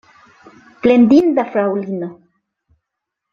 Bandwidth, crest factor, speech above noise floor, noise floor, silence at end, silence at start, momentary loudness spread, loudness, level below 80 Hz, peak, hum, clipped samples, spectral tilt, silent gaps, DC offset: 7 kHz; 16 dB; 66 dB; -80 dBFS; 1.2 s; 0.85 s; 15 LU; -14 LUFS; -56 dBFS; -2 dBFS; none; under 0.1%; -8 dB/octave; none; under 0.1%